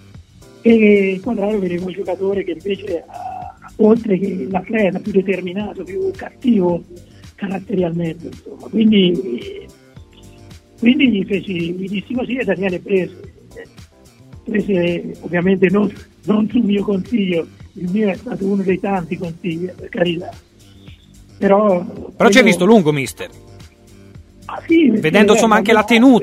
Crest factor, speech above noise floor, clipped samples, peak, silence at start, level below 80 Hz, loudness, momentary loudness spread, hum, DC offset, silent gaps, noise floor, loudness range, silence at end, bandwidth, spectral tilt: 16 dB; 29 dB; under 0.1%; 0 dBFS; 0.15 s; -48 dBFS; -16 LUFS; 17 LU; none; under 0.1%; none; -45 dBFS; 6 LU; 0 s; 14.5 kHz; -6 dB/octave